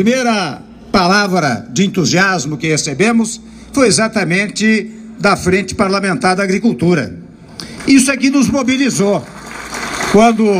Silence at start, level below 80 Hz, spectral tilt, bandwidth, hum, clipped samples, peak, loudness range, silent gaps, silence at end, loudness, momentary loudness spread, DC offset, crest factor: 0 s; -42 dBFS; -4.5 dB/octave; 15.5 kHz; none; under 0.1%; 0 dBFS; 1 LU; none; 0 s; -13 LUFS; 14 LU; under 0.1%; 14 dB